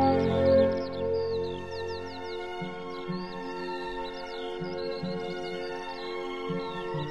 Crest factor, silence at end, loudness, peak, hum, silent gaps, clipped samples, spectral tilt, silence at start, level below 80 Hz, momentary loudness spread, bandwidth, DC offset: 20 dB; 0 s; -31 LUFS; -12 dBFS; none; none; under 0.1%; -7 dB/octave; 0 s; -56 dBFS; 13 LU; 9.6 kHz; 0.4%